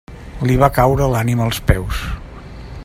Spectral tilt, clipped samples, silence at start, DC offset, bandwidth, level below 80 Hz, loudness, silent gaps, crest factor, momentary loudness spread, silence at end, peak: -6.5 dB/octave; under 0.1%; 0.1 s; under 0.1%; 16 kHz; -26 dBFS; -16 LUFS; none; 16 dB; 22 LU; 0 s; 0 dBFS